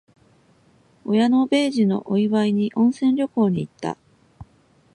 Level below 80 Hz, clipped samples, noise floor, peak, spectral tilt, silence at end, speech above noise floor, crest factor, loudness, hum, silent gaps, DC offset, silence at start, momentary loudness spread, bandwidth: -60 dBFS; under 0.1%; -58 dBFS; -8 dBFS; -7 dB/octave; 0.5 s; 38 dB; 14 dB; -20 LUFS; none; none; under 0.1%; 1.05 s; 13 LU; 11.5 kHz